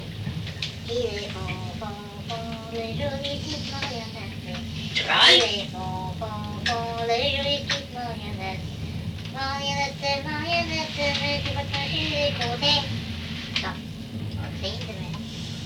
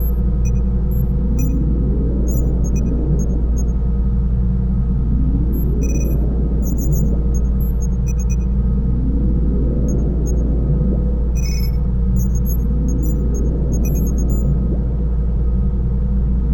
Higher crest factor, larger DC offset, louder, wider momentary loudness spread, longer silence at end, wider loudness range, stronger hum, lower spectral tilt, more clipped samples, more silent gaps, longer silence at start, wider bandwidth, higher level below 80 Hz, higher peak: first, 20 dB vs 10 dB; neither; second, -26 LUFS vs -19 LUFS; first, 12 LU vs 1 LU; about the same, 0 s vs 0 s; first, 9 LU vs 0 LU; neither; second, -4 dB/octave vs -8.5 dB/octave; neither; neither; about the same, 0 s vs 0 s; about the same, 19 kHz vs 17.5 kHz; second, -46 dBFS vs -16 dBFS; about the same, -6 dBFS vs -6 dBFS